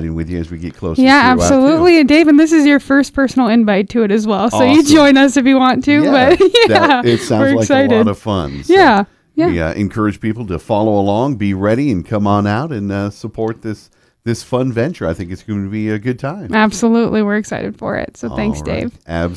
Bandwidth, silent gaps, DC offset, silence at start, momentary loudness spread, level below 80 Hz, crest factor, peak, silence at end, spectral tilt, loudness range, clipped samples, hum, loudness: 11 kHz; none; under 0.1%; 0 s; 14 LU; -38 dBFS; 12 dB; 0 dBFS; 0 s; -5.5 dB/octave; 9 LU; 0.1%; none; -13 LUFS